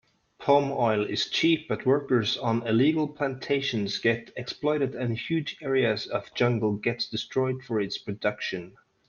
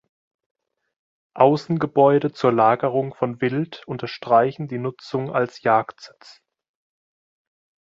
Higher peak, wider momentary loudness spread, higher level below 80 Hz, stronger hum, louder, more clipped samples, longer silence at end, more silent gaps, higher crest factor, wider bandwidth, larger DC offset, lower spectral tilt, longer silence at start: second, -8 dBFS vs -2 dBFS; second, 8 LU vs 12 LU; about the same, -66 dBFS vs -66 dBFS; neither; second, -27 LUFS vs -21 LUFS; neither; second, 0.4 s vs 1.85 s; neither; about the same, 18 dB vs 20 dB; about the same, 7.2 kHz vs 7.6 kHz; neither; second, -6 dB/octave vs -7.5 dB/octave; second, 0.4 s vs 1.35 s